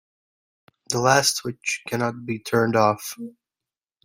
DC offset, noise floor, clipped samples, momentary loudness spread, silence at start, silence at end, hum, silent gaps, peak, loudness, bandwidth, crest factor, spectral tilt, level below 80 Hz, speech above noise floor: under 0.1%; -90 dBFS; under 0.1%; 14 LU; 0.9 s; 0.75 s; none; none; -2 dBFS; -22 LUFS; 16.5 kHz; 22 dB; -3.5 dB/octave; -64 dBFS; 67 dB